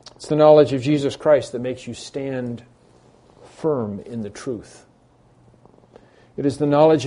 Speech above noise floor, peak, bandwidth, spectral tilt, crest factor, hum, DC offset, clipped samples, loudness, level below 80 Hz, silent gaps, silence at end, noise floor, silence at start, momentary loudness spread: 36 dB; -2 dBFS; 10.5 kHz; -6.5 dB/octave; 20 dB; none; under 0.1%; under 0.1%; -20 LUFS; -58 dBFS; none; 0 s; -55 dBFS; 0.2 s; 18 LU